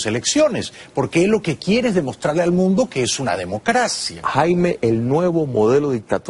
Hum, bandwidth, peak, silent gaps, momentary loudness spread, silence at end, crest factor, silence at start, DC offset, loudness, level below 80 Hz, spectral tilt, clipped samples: none; 11.5 kHz; -2 dBFS; none; 5 LU; 0 s; 16 dB; 0 s; under 0.1%; -18 LUFS; -50 dBFS; -5 dB/octave; under 0.1%